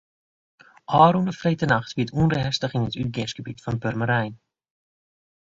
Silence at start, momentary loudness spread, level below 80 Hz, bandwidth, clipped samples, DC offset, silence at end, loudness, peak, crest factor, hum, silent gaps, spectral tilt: 0.9 s; 13 LU; -50 dBFS; 7.8 kHz; under 0.1%; under 0.1%; 1.15 s; -23 LUFS; -2 dBFS; 22 dB; none; none; -6.5 dB/octave